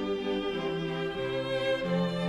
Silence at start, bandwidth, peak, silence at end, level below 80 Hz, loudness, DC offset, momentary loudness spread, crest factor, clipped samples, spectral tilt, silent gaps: 0 s; 10.5 kHz; -18 dBFS; 0 s; -56 dBFS; -31 LUFS; under 0.1%; 4 LU; 12 dB; under 0.1%; -6.5 dB/octave; none